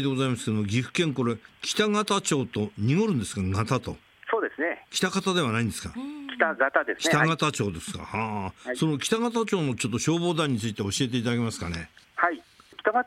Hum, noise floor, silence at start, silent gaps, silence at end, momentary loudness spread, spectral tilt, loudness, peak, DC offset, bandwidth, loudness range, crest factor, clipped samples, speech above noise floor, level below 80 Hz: none; -48 dBFS; 0 s; none; 0 s; 9 LU; -4.5 dB/octave; -27 LUFS; -6 dBFS; under 0.1%; 16 kHz; 2 LU; 20 dB; under 0.1%; 21 dB; -60 dBFS